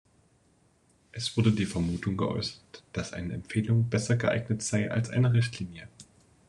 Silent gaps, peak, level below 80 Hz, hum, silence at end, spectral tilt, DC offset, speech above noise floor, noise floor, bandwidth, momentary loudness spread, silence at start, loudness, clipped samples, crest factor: none; -12 dBFS; -56 dBFS; none; 0.45 s; -6 dB/octave; under 0.1%; 37 dB; -66 dBFS; 11 kHz; 13 LU; 1.15 s; -29 LUFS; under 0.1%; 18 dB